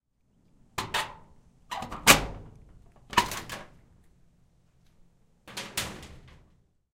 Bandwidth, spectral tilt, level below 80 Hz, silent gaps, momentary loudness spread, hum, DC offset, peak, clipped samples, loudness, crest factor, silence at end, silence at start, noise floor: 16.5 kHz; -1.5 dB/octave; -50 dBFS; none; 23 LU; none; under 0.1%; -2 dBFS; under 0.1%; -27 LUFS; 30 dB; 0.75 s; 0.75 s; -67 dBFS